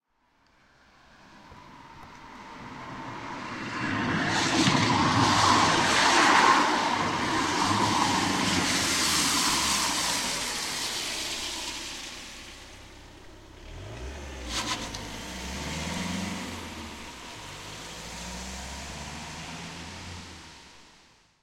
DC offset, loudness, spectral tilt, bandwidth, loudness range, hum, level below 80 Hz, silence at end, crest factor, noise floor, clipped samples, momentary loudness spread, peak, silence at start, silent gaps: under 0.1%; -25 LUFS; -2.5 dB/octave; 16.5 kHz; 17 LU; none; -50 dBFS; 0.6 s; 22 dB; -67 dBFS; under 0.1%; 22 LU; -6 dBFS; 1.3 s; none